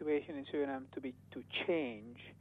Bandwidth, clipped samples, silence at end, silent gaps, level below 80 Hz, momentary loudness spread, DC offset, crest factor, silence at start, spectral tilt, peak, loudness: 4.7 kHz; under 0.1%; 0.05 s; none; -78 dBFS; 14 LU; under 0.1%; 16 dB; 0 s; -7 dB/octave; -24 dBFS; -40 LUFS